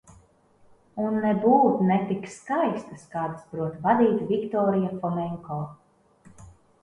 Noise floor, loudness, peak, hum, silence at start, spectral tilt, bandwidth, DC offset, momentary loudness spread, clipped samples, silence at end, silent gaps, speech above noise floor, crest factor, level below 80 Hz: -59 dBFS; -25 LUFS; -8 dBFS; none; 0.95 s; -8 dB/octave; 10.5 kHz; under 0.1%; 14 LU; under 0.1%; 0.35 s; none; 35 dB; 18 dB; -62 dBFS